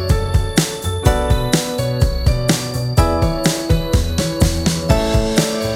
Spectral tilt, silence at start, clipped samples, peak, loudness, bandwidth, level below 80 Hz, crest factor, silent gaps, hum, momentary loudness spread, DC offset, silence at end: -5 dB/octave; 0 s; under 0.1%; 0 dBFS; -17 LUFS; 17 kHz; -22 dBFS; 16 dB; none; none; 3 LU; under 0.1%; 0 s